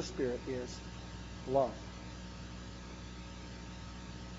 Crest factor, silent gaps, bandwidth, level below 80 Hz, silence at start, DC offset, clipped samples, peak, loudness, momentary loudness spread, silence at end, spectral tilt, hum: 22 dB; none; 7.6 kHz; -52 dBFS; 0 s; under 0.1%; under 0.1%; -18 dBFS; -41 LUFS; 14 LU; 0 s; -5 dB/octave; 60 Hz at -50 dBFS